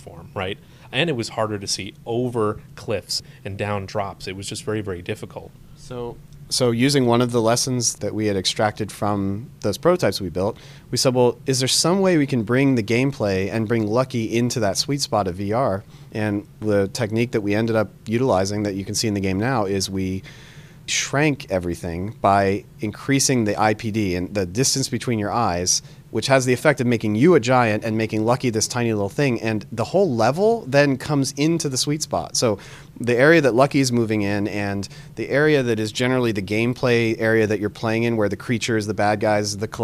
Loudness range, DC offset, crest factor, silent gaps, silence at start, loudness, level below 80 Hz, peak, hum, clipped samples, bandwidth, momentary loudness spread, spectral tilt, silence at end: 6 LU; under 0.1%; 20 dB; none; 0 s; -21 LUFS; -52 dBFS; -2 dBFS; none; under 0.1%; 15.5 kHz; 11 LU; -4.5 dB/octave; 0 s